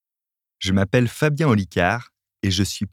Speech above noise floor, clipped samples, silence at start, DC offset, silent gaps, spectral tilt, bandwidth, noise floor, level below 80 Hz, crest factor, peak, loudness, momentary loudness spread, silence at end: 69 dB; under 0.1%; 0.6 s; under 0.1%; none; -5.5 dB/octave; 16 kHz; -88 dBFS; -50 dBFS; 18 dB; -4 dBFS; -21 LUFS; 8 LU; 0.05 s